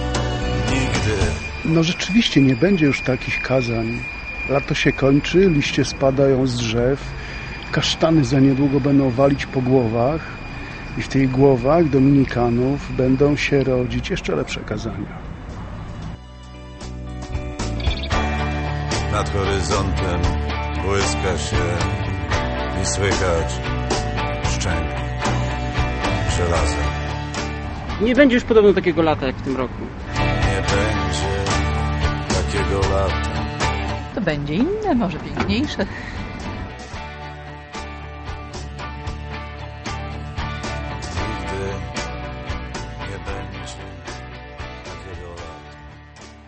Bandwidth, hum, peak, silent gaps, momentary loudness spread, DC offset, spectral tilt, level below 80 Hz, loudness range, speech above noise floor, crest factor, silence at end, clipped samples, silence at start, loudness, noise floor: 8.8 kHz; none; 0 dBFS; none; 17 LU; under 0.1%; -5.5 dB/octave; -30 dBFS; 12 LU; 23 dB; 20 dB; 0 s; under 0.1%; 0 s; -20 LUFS; -41 dBFS